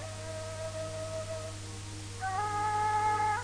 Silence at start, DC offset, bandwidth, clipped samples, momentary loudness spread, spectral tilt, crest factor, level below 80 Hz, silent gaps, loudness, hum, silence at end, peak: 0 s; 0.1%; 10.5 kHz; under 0.1%; 13 LU; -4 dB/octave; 14 dB; -54 dBFS; none; -34 LUFS; 50 Hz at -45 dBFS; 0 s; -20 dBFS